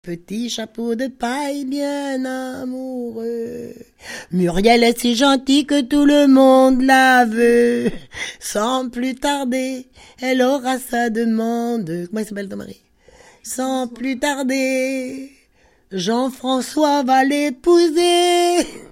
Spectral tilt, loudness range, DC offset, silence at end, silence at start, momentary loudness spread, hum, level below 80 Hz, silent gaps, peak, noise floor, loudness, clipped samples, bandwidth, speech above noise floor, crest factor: -4 dB/octave; 11 LU; under 0.1%; 0.05 s; 0.05 s; 16 LU; none; -46 dBFS; none; 0 dBFS; -56 dBFS; -17 LUFS; under 0.1%; 16.5 kHz; 39 dB; 18 dB